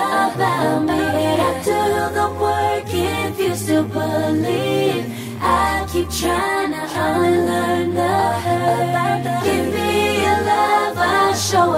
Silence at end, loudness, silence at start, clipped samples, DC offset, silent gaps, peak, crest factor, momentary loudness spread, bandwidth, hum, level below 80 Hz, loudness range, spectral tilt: 0 s; -18 LUFS; 0 s; under 0.1%; under 0.1%; none; -4 dBFS; 14 dB; 5 LU; 16 kHz; none; -42 dBFS; 2 LU; -5 dB/octave